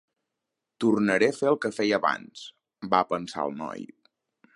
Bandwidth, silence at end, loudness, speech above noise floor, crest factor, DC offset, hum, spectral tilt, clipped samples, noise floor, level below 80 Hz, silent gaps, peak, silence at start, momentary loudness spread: 11.5 kHz; 0.7 s; -26 LUFS; 59 dB; 22 dB; under 0.1%; none; -5 dB/octave; under 0.1%; -85 dBFS; -70 dBFS; none; -6 dBFS; 0.8 s; 20 LU